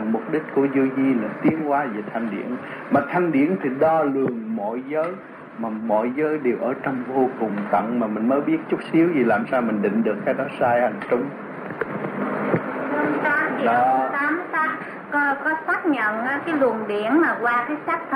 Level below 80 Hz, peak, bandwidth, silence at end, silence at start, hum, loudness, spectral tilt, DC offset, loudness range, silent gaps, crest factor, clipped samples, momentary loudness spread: -68 dBFS; -6 dBFS; 10 kHz; 0 s; 0 s; none; -22 LUFS; -8 dB/octave; under 0.1%; 3 LU; none; 16 dB; under 0.1%; 8 LU